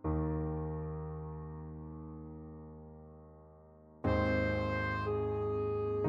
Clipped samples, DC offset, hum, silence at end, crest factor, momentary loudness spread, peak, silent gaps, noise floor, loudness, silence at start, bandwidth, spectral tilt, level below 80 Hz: under 0.1%; under 0.1%; none; 0 s; 16 dB; 20 LU; -20 dBFS; none; -58 dBFS; -36 LUFS; 0 s; 7.2 kHz; -9 dB/octave; -48 dBFS